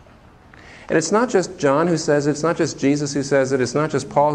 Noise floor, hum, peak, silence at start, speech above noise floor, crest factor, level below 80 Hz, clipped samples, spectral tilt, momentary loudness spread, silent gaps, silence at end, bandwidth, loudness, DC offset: -47 dBFS; none; -4 dBFS; 0.65 s; 29 dB; 16 dB; -54 dBFS; under 0.1%; -5 dB/octave; 3 LU; none; 0 s; 10.5 kHz; -19 LUFS; under 0.1%